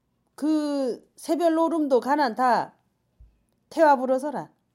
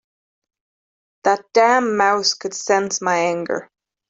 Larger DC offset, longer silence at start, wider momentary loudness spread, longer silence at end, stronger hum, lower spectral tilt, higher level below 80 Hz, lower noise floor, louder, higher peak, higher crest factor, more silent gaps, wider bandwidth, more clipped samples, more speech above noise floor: neither; second, 0.4 s vs 1.25 s; first, 14 LU vs 9 LU; second, 0.3 s vs 0.45 s; neither; first, -5 dB/octave vs -2.5 dB/octave; about the same, -66 dBFS vs -68 dBFS; second, -57 dBFS vs under -90 dBFS; second, -24 LUFS vs -18 LUFS; second, -8 dBFS vs -2 dBFS; about the same, 16 dB vs 18 dB; neither; first, 16 kHz vs 8.2 kHz; neither; second, 34 dB vs over 72 dB